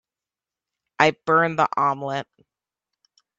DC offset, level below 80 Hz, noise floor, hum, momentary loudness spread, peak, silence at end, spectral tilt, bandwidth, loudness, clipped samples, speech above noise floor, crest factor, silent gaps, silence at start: under 0.1%; -68 dBFS; -90 dBFS; none; 11 LU; 0 dBFS; 1.15 s; -5 dB/octave; 7.8 kHz; -21 LUFS; under 0.1%; 68 dB; 24 dB; none; 1 s